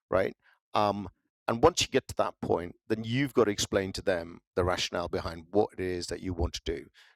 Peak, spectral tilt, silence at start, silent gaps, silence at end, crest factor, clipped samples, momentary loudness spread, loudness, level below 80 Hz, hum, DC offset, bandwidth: -6 dBFS; -4.5 dB/octave; 0.1 s; 0.61-0.72 s, 1.30-1.46 s, 4.47-4.51 s; 0.3 s; 24 dB; under 0.1%; 10 LU; -30 LUFS; -50 dBFS; none; under 0.1%; 15.5 kHz